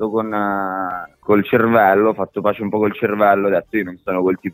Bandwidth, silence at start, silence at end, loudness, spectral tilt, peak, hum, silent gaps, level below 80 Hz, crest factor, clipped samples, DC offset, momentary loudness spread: 16 kHz; 0 s; 0 s; -17 LUFS; -9.5 dB/octave; 0 dBFS; none; none; -58 dBFS; 16 dB; under 0.1%; under 0.1%; 10 LU